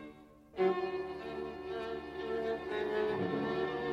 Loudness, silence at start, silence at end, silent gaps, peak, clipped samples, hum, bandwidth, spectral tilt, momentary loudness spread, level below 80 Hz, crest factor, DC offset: -36 LUFS; 0 s; 0 s; none; -20 dBFS; under 0.1%; none; 7.6 kHz; -7 dB/octave; 9 LU; -62 dBFS; 18 dB; under 0.1%